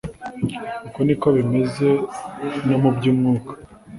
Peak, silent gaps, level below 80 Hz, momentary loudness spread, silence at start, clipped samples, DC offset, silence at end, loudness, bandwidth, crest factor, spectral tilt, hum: -4 dBFS; none; -50 dBFS; 13 LU; 0.05 s; under 0.1%; under 0.1%; 0 s; -20 LUFS; 11.5 kHz; 16 dB; -8 dB/octave; none